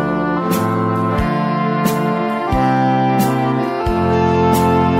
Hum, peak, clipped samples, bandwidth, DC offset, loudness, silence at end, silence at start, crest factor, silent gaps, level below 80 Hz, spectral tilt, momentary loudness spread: none; -4 dBFS; under 0.1%; 16 kHz; under 0.1%; -16 LUFS; 0 s; 0 s; 12 dB; none; -34 dBFS; -7 dB/octave; 4 LU